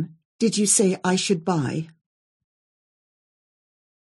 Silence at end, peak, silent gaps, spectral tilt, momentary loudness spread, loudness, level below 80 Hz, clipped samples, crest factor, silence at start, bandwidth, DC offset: 2.3 s; -6 dBFS; 0.25-0.39 s; -4 dB/octave; 15 LU; -21 LUFS; -70 dBFS; under 0.1%; 20 dB; 0 s; 12 kHz; under 0.1%